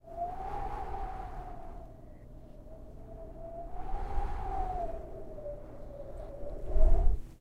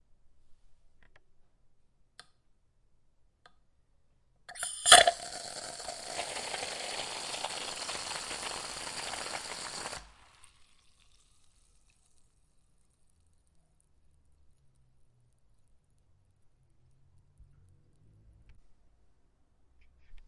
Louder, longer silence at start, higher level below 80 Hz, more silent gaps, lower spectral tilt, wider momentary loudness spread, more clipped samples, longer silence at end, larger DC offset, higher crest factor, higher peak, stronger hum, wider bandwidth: second, -39 LUFS vs -29 LUFS; second, 0.05 s vs 0.25 s; first, -34 dBFS vs -64 dBFS; neither; first, -8.5 dB/octave vs 1 dB/octave; about the same, 19 LU vs 21 LU; neither; about the same, 0.05 s vs 0.05 s; neither; second, 20 dB vs 36 dB; second, -12 dBFS vs 0 dBFS; neither; second, 3.1 kHz vs 12 kHz